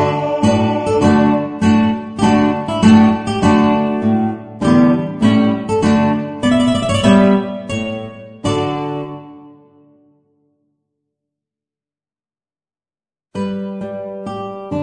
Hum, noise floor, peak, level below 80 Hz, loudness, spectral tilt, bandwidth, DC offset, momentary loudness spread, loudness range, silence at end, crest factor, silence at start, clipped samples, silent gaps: none; under -90 dBFS; 0 dBFS; -44 dBFS; -15 LUFS; -6.5 dB/octave; 10 kHz; under 0.1%; 15 LU; 16 LU; 0 s; 16 dB; 0 s; under 0.1%; none